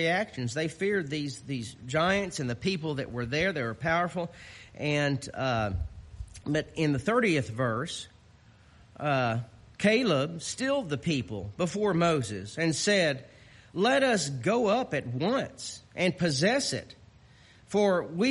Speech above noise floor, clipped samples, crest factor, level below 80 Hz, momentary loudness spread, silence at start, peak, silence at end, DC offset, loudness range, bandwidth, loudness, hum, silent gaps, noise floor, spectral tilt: 29 dB; under 0.1%; 18 dB; -52 dBFS; 12 LU; 0 s; -12 dBFS; 0 s; under 0.1%; 3 LU; 11.5 kHz; -29 LUFS; none; none; -57 dBFS; -5 dB/octave